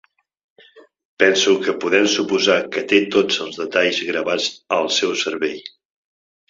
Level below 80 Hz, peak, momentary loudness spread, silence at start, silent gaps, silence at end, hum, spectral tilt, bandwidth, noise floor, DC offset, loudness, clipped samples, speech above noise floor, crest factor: -64 dBFS; -2 dBFS; 6 LU; 0.75 s; 1.05-1.17 s; 0.8 s; none; -2.5 dB/octave; 7.8 kHz; -49 dBFS; under 0.1%; -18 LUFS; under 0.1%; 31 dB; 18 dB